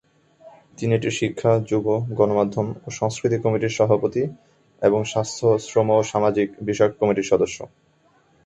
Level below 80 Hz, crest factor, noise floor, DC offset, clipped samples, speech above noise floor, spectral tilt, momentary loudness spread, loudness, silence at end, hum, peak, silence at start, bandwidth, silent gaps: -56 dBFS; 18 dB; -59 dBFS; under 0.1%; under 0.1%; 39 dB; -6 dB/octave; 7 LU; -21 LUFS; 0.8 s; none; -4 dBFS; 0.45 s; 8.4 kHz; none